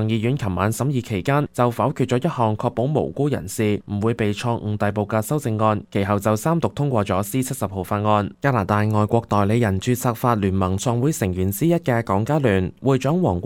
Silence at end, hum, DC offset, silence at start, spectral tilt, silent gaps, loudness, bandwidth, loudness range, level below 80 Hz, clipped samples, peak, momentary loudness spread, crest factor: 0 s; none; under 0.1%; 0 s; -6.5 dB/octave; none; -21 LUFS; 17 kHz; 2 LU; -50 dBFS; under 0.1%; -4 dBFS; 4 LU; 18 dB